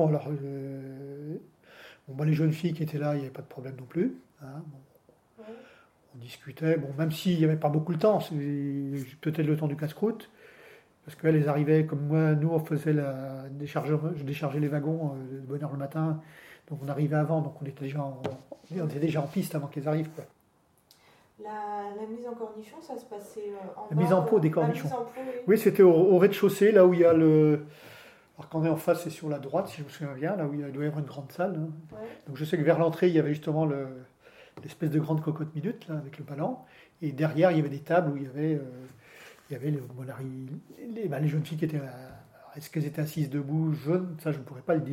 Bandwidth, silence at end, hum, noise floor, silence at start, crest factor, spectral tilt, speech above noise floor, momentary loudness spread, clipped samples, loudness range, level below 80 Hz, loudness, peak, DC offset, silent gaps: 16 kHz; 0 s; none; -66 dBFS; 0 s; 22 dB; -8 dB/octave; 38 dB; 19 LU; under 0.1%; 12 LU; -74 dBFS; -28 LUFS; -8 dBFS; under 0.1%; none